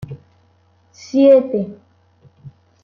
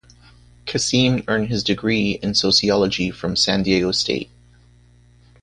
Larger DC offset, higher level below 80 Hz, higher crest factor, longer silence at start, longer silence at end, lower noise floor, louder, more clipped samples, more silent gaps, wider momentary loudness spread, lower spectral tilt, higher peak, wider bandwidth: neither; second, -60 dBFS vs -46 dBFS; about the same, 16 dB vs 18 dB; second, 0 s vs 0.65 s; second, 0.35 s vs 1.2 s; first, -56 dBFS vs -51 dBFS; first, -14 LUFS vs -19 LUFS; neither; neither; first, 24 LU vs 8 LU; first, -7.5 dB/octave vs -4 dB/octave; about the same, -2 dBFS vs -2 dBFS; second, 7 kHz vs 10.5 kHz